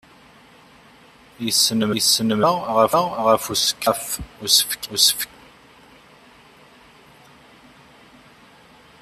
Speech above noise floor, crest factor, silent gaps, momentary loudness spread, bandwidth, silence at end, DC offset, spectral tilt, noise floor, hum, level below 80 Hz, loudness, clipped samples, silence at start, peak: 30 dB; 22 dB; none; 10 LU; 14.5 kHz; 3.75 s; under 0.1%; -2 dB/octave; -49 dBFS; none; -54 dBFS; -18 LUFS; under 0.1%; 1.4 s; -2 dBFS